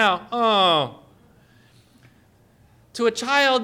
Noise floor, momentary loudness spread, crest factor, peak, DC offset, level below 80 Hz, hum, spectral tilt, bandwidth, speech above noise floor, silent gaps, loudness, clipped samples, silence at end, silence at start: -56 dBFS; 10 LU; 18 dB; -6 dBFS; under 0.1%; -66 dBFS; none; -3 dB/octave; 16.5 kHz; 37 dB; none; -20 LUFS; under 0.1%; 0 s; 0 s